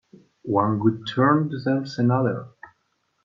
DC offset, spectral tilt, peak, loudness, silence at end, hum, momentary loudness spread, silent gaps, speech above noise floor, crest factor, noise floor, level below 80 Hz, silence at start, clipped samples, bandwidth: under 0.1%; -8.5 dB/octave; -4 dBFS; -22 LUFS; 0.75 s; none; 7 LU; none; 50 dB; 18 dB; -71 dBFS; -66 dBFS; 0.45 s; under 0.1%; 7.4 kHz